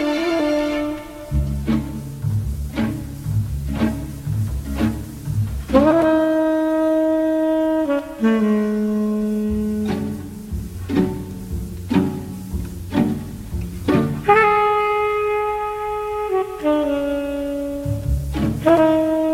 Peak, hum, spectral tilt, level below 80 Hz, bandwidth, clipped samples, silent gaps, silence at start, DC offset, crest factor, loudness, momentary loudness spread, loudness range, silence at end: -2 dBFS; none; -7.5 dB/octave; -32 dBFS; 16.5 kHz; under 0.1%; none; 0 s; under 0.1%; 18 dB; -20 LUFS; 13 LU; 6 LU; 0 s